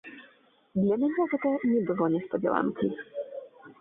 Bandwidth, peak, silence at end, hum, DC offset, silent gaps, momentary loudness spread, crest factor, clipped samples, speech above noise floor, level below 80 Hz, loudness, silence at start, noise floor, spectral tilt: 3.8 kHz; -10 dBFS; 0.1 s; none; under 0.1%; none; 12 LU; 18 dB; under 0.1%; 34 dB; -68 dBFS; -28 LUFS; 0.05 s; -61 dBFS; -11.5 dB/octave